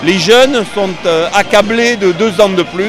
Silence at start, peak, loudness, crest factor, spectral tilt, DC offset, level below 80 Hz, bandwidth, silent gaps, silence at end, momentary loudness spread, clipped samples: 0 s; 0 dBFS; -10 LUFS; 10 dB; -4 dB/octave; under 0.1%; -42 dBFS; 16 kHz; none; 0 s; 6 LU; 0.6%